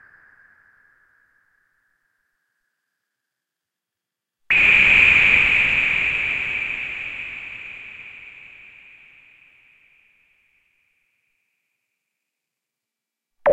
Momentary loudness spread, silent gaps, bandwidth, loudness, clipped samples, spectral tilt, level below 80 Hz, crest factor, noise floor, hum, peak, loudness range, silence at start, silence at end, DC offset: 25 LU; none; 8.8 kHz; -15 LUFS; under 0.1%; -3 dB/octave; -48 dBFS; 22 dB; -85 dBFS; none; -2 dBFS; 19 LU; 4.5 s; 0 s; under 0.1%